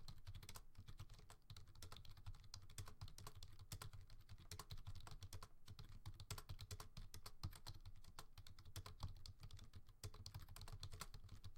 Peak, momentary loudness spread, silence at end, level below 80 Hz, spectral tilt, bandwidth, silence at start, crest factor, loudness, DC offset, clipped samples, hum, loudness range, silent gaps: -36 dBFS; 7 LU; 0 s; -60 dBFS; -3.5 dB/octave; 16.5 kHz; 0 s; 20 dB; -60 LUFS; under 0.1%; under 0.1%; none; 2 LU; none